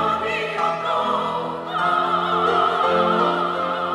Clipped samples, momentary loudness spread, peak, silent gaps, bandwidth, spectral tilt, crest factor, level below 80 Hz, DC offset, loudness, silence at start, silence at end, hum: under 0.1%; 5 LU; -6 dBFS; none; 12.5 kHz; -5.5 dB/octave; 14 dB; -62 dBFS; under 0.1%; -20 LUFS; 0 s; 0 s; none